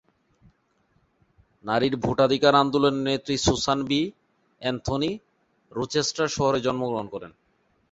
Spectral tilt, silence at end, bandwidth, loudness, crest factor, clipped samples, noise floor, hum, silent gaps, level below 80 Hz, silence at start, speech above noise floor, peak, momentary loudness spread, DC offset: -4.5 dB/octave; 0.6 s; 8 kHz; -24 LUFS; 22 dB; under 0.1%; -67 dBFS; none; none; -48 dBFS; 1.65 s; 44 dB; -4 dBFS; 13 LU; under 0.1%